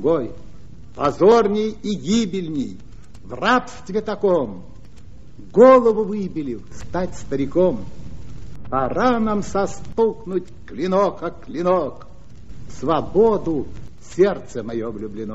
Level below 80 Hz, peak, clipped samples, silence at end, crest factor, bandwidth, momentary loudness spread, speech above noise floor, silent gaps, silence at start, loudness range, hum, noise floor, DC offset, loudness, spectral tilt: -44 dBFS; 0 dBFS; under 0.1%; 0 s; 20 dB; 8 kHz; 19 LU; 24 dB; none; 0 s; 5 LU; none; -43 dBFS; 2%; -20 LUFS; -5.5 dB/octave